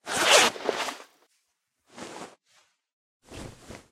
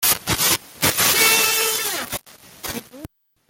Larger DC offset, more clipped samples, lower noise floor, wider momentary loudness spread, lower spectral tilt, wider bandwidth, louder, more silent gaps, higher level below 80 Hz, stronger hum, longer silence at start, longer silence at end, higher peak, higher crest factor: neither; neither; first, -77 dBFS vs -42 dBFS; first, 26 LU vs 17 LU; about the same, -0.5 dB/octave vs -0.5 dB/octave; about the same, 16 kHz vs 17 kHz; second, -22 LUFS vs -17 LUFS; first, 2.93-3.20 s vs none; second, -60 dBFS vs -48 dBFS; neither; about the same, 0.05 s vs 0 s; second, 0.15 s vs 0.45 s; second, -4 dBFS vs 0 dBFS; first, 26 dB vs 20 dB